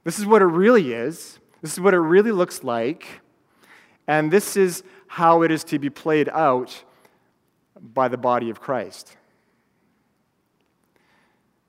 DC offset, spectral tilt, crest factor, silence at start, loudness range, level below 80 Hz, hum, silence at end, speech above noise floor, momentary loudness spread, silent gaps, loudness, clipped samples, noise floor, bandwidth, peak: under 0.1%; -5.5 dB/octave; 20 dB; 0.05 s; 8 LU; -76 dBFS; none; 2.65 s; 49 dB; 20 LU; none; -20 LUFS; under 0.1%; -68 dBFS; 16 kHz; -2 dBFS